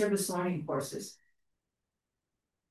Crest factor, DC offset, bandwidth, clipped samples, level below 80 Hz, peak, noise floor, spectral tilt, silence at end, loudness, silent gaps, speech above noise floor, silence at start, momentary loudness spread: 20 dB; under 0.1%; 13 kHz; under 0.1%; -80 dBFS; -16 dBFS; -88 dBFS; -5 dB/octave; 1.55 s; -34 LUFS; none; 55 dB; 0 s; 12 LU